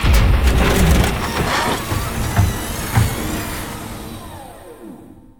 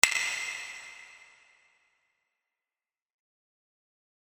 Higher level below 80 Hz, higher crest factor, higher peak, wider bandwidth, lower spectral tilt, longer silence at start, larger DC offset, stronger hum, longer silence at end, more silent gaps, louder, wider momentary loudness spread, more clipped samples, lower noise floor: first, -22 dBFS vs -76 dBFS; second, 16 dB vs 36 dB; about the same, -2 dBFS vs -2 dBFS; first, 19.5 kHz vs 17 kHz; first, -5 dB/octave vs 2.5 dB/octave; about the same, 0 s vs 0.05 s; neither; neither; second, 0.2 s vs 3.15 s; neither; first, -18 LUFS vs -31 LUFS; second, 21 LU vs 24 LU; neither; second, -39 dBFS vs under -90 dBFS